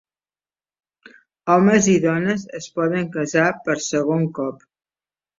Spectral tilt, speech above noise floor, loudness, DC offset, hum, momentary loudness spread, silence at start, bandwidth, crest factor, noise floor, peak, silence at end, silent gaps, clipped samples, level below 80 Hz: -5.5 dB/octave; over 71 dB; -19 LUFS; under 0.1%; none; 13 LU; 1.45 s; 7.8 kHz; 18 dB; under -90 dBFS; -2 dBFS; 0.85 s; none; under 0.1%; -60 dBFS